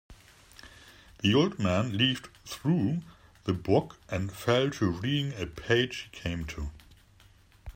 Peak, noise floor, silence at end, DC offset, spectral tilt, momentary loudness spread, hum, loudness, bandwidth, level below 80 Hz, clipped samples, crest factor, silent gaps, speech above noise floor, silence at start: -10 dBFS; -59 dBFS; 0.05 s; under 0.1%; -6 dB/octave; 13 LU; none; -29 LUFS; 16 kHz; -50 dBFS; under 0.1%; 20 dB; none; 30 dB; 0.1 s